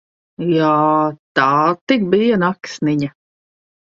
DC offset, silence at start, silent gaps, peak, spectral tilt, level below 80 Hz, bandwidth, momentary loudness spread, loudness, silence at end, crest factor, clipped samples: under 0.1%; 0.4 s; 1.19-1.35 s, 1.81-1.87 s; 0 dBFS; -6.5 dB/octave; -60 dBFS; 7.6 kHz; 8 LU; -16 LUFS; 0.8 s; 16 dB; under 0.1%